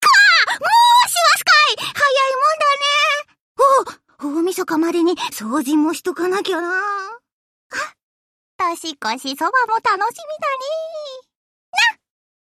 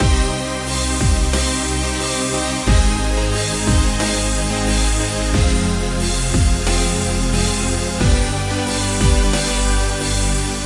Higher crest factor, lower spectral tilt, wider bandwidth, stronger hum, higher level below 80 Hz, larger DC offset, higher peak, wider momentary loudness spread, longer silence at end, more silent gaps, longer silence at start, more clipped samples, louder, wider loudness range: about the same, 14 dB vs 14 dB; second, -1 dB/octave vs -4 dB/octave; first, 15.5 kHz vs 11.5 kHz; neither; second, -70 dBFS vs -20 dBFS; neither; about the same, -2 dBFS vs -2 dBFS; first, 16 LU vs 3 LU; first, 0.5 s vs 0 s; first, 3.40-3.55 s, 7.32-7.70 s, 8.03-8.59 s, 11.35-11.73 s vs none; about the same, 0 s vs 0 s; neither; about the same, -16 LUFS vs -18 LUFS; first, 9 LU vs 1 LU